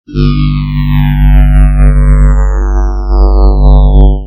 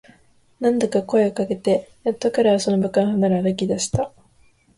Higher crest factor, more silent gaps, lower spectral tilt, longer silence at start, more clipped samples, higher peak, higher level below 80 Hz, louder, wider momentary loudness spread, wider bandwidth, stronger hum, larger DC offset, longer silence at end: second, 6 dB vs 16 dB; neither; first, -8.5 dB/octave vs -6 dB/octave; second, 0.1 s vs 0.6 s; first, 1% vs under 0.1%; first, 0 dBFS vs -6 dBFS; first, -6 dBFS vs -52 dBFS; first, -9 LUFS vs -21 LUFS; about the same, 5 LU vs 6 LU; second, 5.4 kHz vs 11.5 kHz; first, 50 Hz at -10 dBFS vs none; neither; second, 0 s vs 0.7 s